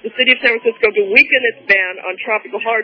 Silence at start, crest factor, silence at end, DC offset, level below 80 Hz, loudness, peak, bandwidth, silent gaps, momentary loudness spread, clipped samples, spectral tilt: 0.05 s; 16 dB; 0 s; under 0.1%; -58 dBFS; -13 LUFS; 0 dBFS; 5.4 kHz; none; 10 LU; under 0.1%; -4 dB/octave